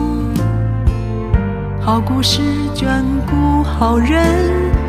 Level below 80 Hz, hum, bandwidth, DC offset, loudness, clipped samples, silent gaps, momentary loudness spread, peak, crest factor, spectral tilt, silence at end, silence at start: -20 dBFS; none; 15 kHz; under 0.1%; -16 LUFS; under 0.1%; none; 5 LU; -2 dBFS; 14 dB; -6 dB/octave; 0 s; 0 s